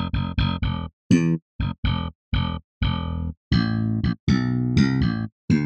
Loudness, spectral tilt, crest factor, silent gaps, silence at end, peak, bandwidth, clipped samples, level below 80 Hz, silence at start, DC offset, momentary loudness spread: -24 LUFS; -7 dB/octave; 18 dB; 0.93-1.10 s, 1.42-1.59 s, 1.78-1.83 s, 2.15-2.32 s, 2.64-2.81 s, 3.37-3.51 s, 4.20-4.27 s, 5.32-5.48 s; 0 s; -6 dBFS; 8.6 kHz; under 0.1%; -32 dBFS; 0 s; under 0.1%; 9 LU